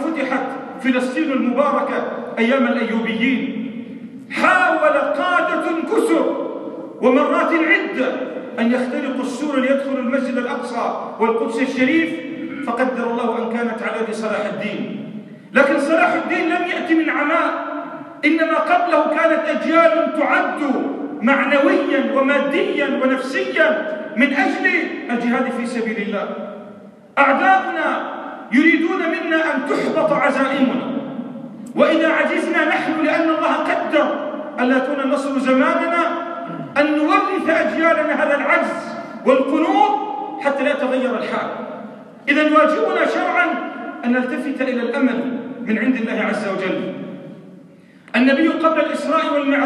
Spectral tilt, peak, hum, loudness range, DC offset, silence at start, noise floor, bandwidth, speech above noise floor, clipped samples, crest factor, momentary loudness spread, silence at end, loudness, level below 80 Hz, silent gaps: -5 dB/octave; 0 dBFS; none; 4 LU; under 0.1%; 0 s; -45 dBFS; 11.5 kHz; 27 dB; under 0.1%; 18 dB; 11 LU; 0 s; -18 LUFS; -74 dBFS; none